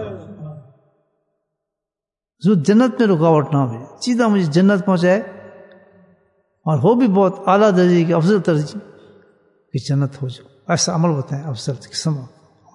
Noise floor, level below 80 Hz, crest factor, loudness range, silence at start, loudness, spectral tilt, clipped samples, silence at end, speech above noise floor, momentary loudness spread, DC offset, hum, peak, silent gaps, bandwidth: -88 dBFS; -66 dBFS; 16 dB; 6 LU; 0 s; -17 LUFS; -6.5 dB/octave; under 0.1%; 0.5 s; 72 dB; 16 LU; under 0.1%; none; -2 dBFS; none; 11 kHz